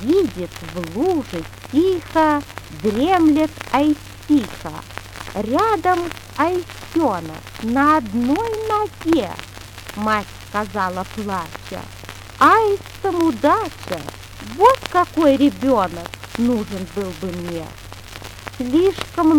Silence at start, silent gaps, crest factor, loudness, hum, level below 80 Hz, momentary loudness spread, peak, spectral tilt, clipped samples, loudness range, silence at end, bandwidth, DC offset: 0 s; none; 20 dB; -19 LUFS; none; -44 dBFS; 18 LU; 0 dBFS; -5.5 dB/octave; under 0.1%; 5 LU; 0 s; 18.5 kHz; under 0.1%